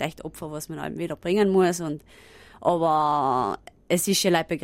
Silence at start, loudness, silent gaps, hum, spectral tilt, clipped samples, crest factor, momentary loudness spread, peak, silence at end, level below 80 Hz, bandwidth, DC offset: 0 s; -24 LUFS; none; none; -4.5 dB/octave; under 0.1%; 18 dB; 14 LU; -8 dBFS; 0 s; -56 dBFS; 16 kHz; under 0.1%